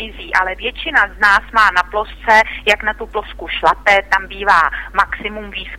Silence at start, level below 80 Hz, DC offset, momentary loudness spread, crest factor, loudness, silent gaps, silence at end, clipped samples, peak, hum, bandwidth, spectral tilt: 0 s; -36 dBFS; under 0.1%; 12 LU; 16 dB; -14 LUFS; none; 0 s; under 0.1%; 0 dBFS; none; 16.5 kHz; -2.5 dB/octave